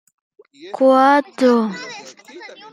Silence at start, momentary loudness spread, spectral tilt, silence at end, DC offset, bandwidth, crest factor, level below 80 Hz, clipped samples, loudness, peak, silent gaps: 0.65 s; 24 LU; -5 dB/octave; 0.25 s; under 0.1%; 11.5 kHz; 16 dB; -74 dBFS; under 0.1%; -15 LUFS; -2 dBFS; none